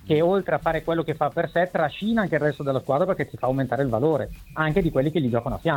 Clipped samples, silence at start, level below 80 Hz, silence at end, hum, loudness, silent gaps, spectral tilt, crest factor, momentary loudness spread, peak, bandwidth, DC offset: under 0.1%; 0.05 s; -44 dBFS; 0 s; none; -24 LUFS; none; -8 dB/octave; 16 dB; 4 LU; -6 dBFS; 18 kHz; under 0.1%